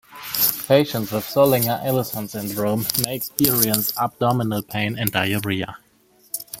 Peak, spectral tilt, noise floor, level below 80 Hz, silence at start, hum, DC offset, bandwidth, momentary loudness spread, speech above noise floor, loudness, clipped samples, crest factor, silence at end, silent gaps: 0 dBFS; -4.5 dB/octave; -57 dBFS; -54 dBFS; 0.1 s; none; under 0.1%; 17 kHz; 11 LU; 36 dB; -20 LUFS; under 0.1%; 22 dB; 0 s; none